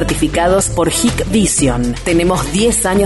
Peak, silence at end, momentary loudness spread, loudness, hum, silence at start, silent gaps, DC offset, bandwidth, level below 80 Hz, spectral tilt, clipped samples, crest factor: -2 dBFS; 0 s; 3 LU; -13 LUFS; none; 0 s; none; under 0.1%; 12 kHz; -26 dBFS; -4 dB/octave; under 0.1%; 12 dB